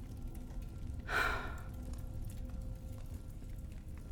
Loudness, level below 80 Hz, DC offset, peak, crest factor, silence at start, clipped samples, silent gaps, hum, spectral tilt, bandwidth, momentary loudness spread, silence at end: -43 LUFS; -46 dBFS; under 0.1%; -20 dBFS; 20 dB; 0 s; under 0.1%; none; none; -5 dB/octave; 17.5 kHz; 14 LU; 0 s